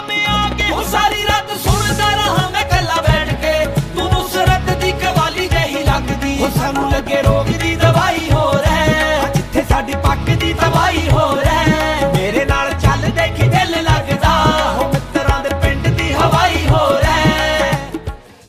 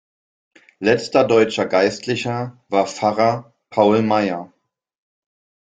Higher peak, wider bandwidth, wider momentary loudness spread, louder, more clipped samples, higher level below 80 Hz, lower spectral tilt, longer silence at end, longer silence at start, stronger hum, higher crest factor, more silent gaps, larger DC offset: about the same, 0 dBFS vs -2 dBFS; first, 15.5 kHz vs 9.4 kHz; second, 4 LU vs 10 LU; first, -15 LUFS vs -18 LUFS; neither; first, -24 dBFS vs -60 dBFS; about the same, -5 dB/octave vs -5.5 dB/octave; second, 0.3 s vs 1.3 s; second, 0 s vs 0.8 s; neither; about the same, 14 dB vs 18 dB; neither; neither